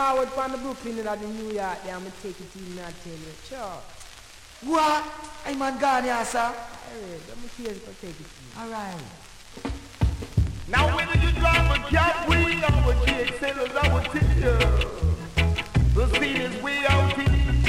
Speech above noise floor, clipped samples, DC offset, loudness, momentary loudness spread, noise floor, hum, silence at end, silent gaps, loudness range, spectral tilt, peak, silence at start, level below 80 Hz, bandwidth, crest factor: 22 dB; under 0.1%; under 0.1%; -24 LUFS; 19 LU; -46 dBFS; none; 0 s; none; 12 LU; -5.5 dB/octave; -6 dBFS; 0 s; -30 dBFS; 14.5 kHz; 18 dB